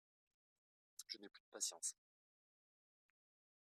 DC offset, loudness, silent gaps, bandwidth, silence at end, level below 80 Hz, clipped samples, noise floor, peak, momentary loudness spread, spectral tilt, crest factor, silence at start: under 0.1%; -47 LUFS; 1.40-1.52 s; 14.5 kHz; 1.7 s; under -90 dBFS; under 0.1%; under -90 dBFS; -30 dBFS; 17 LU; 1.5 dB/octave; 26 dB; 1 s